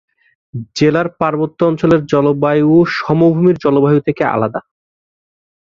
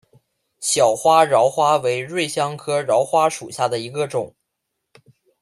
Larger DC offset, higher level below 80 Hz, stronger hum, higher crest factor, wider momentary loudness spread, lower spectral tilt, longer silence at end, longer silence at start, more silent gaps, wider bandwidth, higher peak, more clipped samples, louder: neither; first, -50 dBFS vs -66 dBFS; neither; about the same, 14 dB vs 18 dB; about the same, 9 LU vs 10 LU; first, -7.5 dB/octave vs -3.5 dB/octave; about the same, 1.1 s vs 1.15 s; about the same, 0.55 s vs 0.6 s; neither; second, 7.4 kHz vs 14.5 kHz; about the same, 0 dBFS vs -2 dBFS; neither; first, -13 LUFS vs -19 LUFS